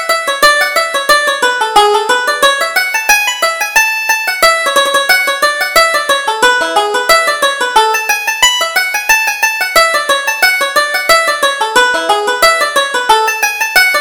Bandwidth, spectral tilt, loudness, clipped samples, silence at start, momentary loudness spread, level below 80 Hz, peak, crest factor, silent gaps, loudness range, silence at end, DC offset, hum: over 20 kHz; 1 dB/octave; -10 LUFS; 0.2%; 0 s; 4 LU; -44 dBFS; 0 dBFS; 12 dB; none; 1 LU; 0 s; under 0.1%; none